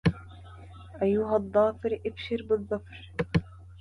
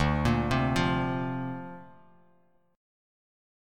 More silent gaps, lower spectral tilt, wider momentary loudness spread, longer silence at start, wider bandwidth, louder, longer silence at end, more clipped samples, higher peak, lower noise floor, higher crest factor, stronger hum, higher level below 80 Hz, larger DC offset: neither; first, -8.5 dB/octave vs -6.5 dB/octave; first, 22 LU vs 16 LU; about the same, 0.05 s vs 0 s; second, 10.5 kHz vs 14.5 kHz; about the same, -29 LUFS vs -28 LUFS; second, 0 s vs 0.95 s; neither; about the same, -12 dBFS vs -12 dBFS; second, -46 dBFS vs -67 dBFS; about the same, 18 dB vs 18 dB; neither; second, -48 dBFS vs -42 dBFS; neither